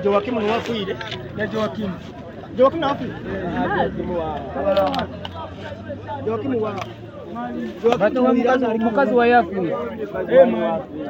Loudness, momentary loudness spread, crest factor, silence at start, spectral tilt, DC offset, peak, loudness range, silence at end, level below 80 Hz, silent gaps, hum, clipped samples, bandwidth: -21 LUFS; 16 LU; 20 dB; 0 s; -7 dB/octave; under 0.1%; -2 dBFS; 7 LU; 0 s; -48 dBFS; none; none; under 0.1%; 16 kHz